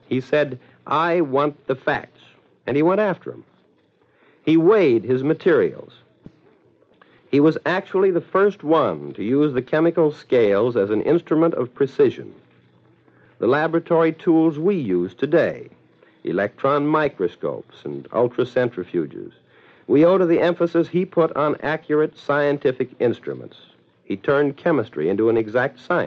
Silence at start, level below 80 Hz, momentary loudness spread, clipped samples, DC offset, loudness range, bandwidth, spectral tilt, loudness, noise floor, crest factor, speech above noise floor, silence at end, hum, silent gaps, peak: 0.1 s; -64 dBFS; 11 LU; under 0.1%; under 0.1%; 3 LU; 6.4 kHz; -8.5 dB/octave; -20 LUFS; -60 dBFS; 16 dB; 40 dB; 0 s; none; none; -6 dBFS